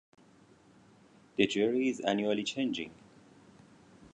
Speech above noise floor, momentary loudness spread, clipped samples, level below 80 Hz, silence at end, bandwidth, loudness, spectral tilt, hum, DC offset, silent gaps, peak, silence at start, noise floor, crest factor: 30 dB; 11 LU; under 0.1%; -72 dBFS; 1.2 s; 10 kHz; -31 LUFS; -4.5 dB/octave; none; under 0.1%; none; -10 dBFS; 1.4 s; -61 dBFS; 24 dB